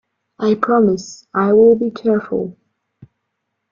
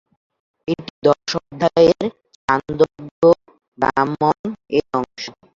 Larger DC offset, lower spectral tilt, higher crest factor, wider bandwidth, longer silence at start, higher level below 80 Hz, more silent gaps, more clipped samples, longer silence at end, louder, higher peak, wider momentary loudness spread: neither; about the same, -7 dB/octave vs -6 dB/octave; about the same, 16 dB vs 18 dB; about the same, 7.4 kHz vs 7.4 kHz; second, 0.4 s vs 0.7 s; second, -58 dBFS vs -52 dBFS; second, none vs 0.90-1.02 s, 2.35-2.48 s, 3.11-3.22 s, 3.68-3.72 s, 4.39-4.44 s; neither; first, 1.2 s vs 0.3 s; first, -16 LUFS vs -19 LUFS; about the same, -2 dBFS vs -2 dBFS; about the same, 12 LU vs 11 LU